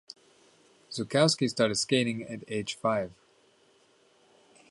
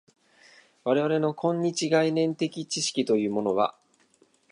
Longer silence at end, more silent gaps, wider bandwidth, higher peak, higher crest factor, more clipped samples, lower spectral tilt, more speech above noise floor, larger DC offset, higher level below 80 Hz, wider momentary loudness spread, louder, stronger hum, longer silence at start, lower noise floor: first, 1.6 s vs 0.8 s; neither; about the same, 11.5 kHz vs 11.5 kHz; about the same, -8 dBFS vs -10 dBFS; first, 24 dB vs 18 dB; neither; about the same, -4 dB/octave vs -4.5 dB/octave; about the same, 36 dB vs 38 dB; neither; first, -68 dBFS vs -74 dBFS; first, 16 LU vs 6 LU; about the same, -28 LUFS vs -26 LUFS; neither; about the same, 0.9 s vs 0.85 s; about the same, -64 dBFS vs -64 dBFS